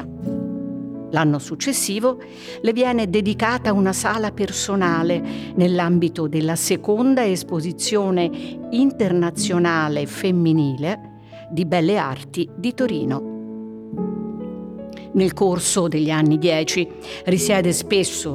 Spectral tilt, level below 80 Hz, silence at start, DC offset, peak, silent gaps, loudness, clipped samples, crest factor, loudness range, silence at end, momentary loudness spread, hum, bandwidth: -5 dB/octave; -52 dBFS; 0 s; under 0.1%; -4 dBFS; none; -20 LUFS; under 0.1%; 16 dB; 4 LU; 0 s; 12 LU; none; 16 kHz